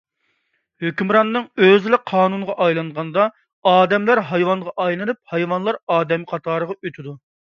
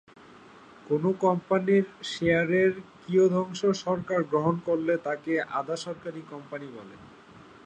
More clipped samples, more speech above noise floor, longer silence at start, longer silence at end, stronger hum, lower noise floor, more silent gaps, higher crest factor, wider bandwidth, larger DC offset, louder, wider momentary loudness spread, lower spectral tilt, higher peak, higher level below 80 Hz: neither; first, 51 dB vs 24 dB; about the same, 0.8 s vs 0.85 s; first, 0.4 s vs 0.25 s; neither; first, -69 dBFS vs -51 dBFS; first, 3.53-3.62 s, 5.83-5.87 s vs none; about the same, 18 dB vs 18 dB; second, 7 kHz vs 9.4 kHz; neither; first, -18 LUFS vs -26 LUFS; second, 10 LU vs 16 LU; about the same, -7.5 dB/octave vs -6.5 dB/octave; first, 0 dBFS vs -10 dBFS; about the same, -68 dBFS vs -64 dBFS